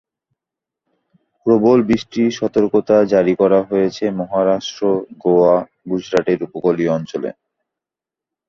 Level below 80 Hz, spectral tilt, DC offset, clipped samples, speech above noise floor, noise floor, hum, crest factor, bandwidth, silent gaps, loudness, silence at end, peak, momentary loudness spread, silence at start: -56 dBFS; -7 dB/octave; under 0.1%; under 0.1%; 72 dB; -87 dBFS; none; 16 dB; 7.4 kHz; none; -17 LUFS; 1.15 s; -2 dBFS; 9 LU; 1.45 s